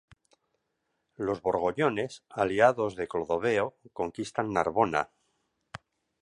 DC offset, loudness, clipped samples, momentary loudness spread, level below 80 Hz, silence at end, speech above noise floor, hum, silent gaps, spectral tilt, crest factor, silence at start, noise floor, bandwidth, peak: under 0.1%; -29 LUFS; under 0.1%; 14 LU; -62 dBFS; 0.45 s; 51 dB; none; none; -5.5 dB/octave; 24 dB; 1.2 s; -79 dBFS; 11 kHz; -6 dBFS